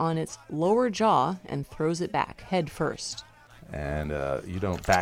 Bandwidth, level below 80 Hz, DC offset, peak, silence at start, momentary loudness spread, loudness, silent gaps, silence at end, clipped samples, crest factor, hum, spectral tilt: 16 kHz; -46 dBFS; under 0.1%; -8 dBFS; 0 s; 12 LU; -28 LUFS; none; 0 s; under 0.1%; 20 dB; none; -5.5 dB/octave